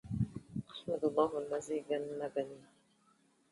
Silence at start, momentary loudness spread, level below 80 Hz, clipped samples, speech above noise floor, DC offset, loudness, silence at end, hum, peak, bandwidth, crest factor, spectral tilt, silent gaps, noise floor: 0.05 s; 12 LU; -62 dBFS; under 0.1%; 35 dB; under 0.1%; -38 LUFS; 0.9 s; none; -16 dBFS; 11.5 kHz; 22 dB; -7 dB/octave; none; -71 dBFS